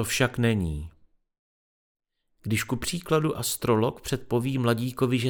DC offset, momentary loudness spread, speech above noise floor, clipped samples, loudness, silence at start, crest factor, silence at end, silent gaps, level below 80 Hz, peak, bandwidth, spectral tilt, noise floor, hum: under 0.1%; 9 LU; over 64 dB; under 0.1%; -26 LUFS; 0 s; 20 dB; 0 s; 1.39-1.95 s; -48 dBFS; -8 dBFS; over 20 kHz; -5 dB/octave; under -90 dBFS; none